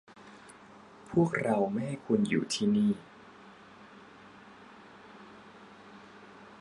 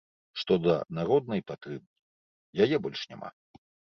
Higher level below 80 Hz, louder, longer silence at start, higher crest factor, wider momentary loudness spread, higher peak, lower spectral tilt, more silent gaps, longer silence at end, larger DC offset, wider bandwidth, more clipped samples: about the same, -68 dBFS vs -66 dBFS; about the same, -30 LUFS vs -29 LUFS; second, 0.2 s vs 0.35 s; about the same, 20 dB vs 20 dB; first, 25 LU vs 17 LU; second, -14 dBFS vs -10 dBFS; about the same, -6 dB/octave vs -7 dB/octave; second, none vs 1.87-2.53 s; second, 0.05 s vs 0.7 s; neither; first, 11.5 kHz vs 6.6 kHz; neither